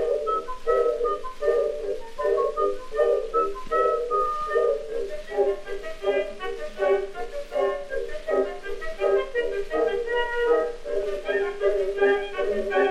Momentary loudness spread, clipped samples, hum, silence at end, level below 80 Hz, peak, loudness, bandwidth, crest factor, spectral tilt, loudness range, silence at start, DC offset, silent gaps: 9 LU; under 0.1%; none; 0 s; -42 dBFS; -10 dBFS; -26 LUFS; 12 kHz; 16 dB; -4.5 dB/octave; 3 LU; 0 s; under 0.1%; none